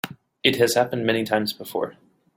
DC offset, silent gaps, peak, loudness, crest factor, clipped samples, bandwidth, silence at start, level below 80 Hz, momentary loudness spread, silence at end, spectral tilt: under 0.1%; none; -2 dBFS; -23 LUFS; 22 dB; under 0.1%; 17 kHz; 0.05 s; -62 dBFS; 11 LU; 0.45 s; -4 dB/octave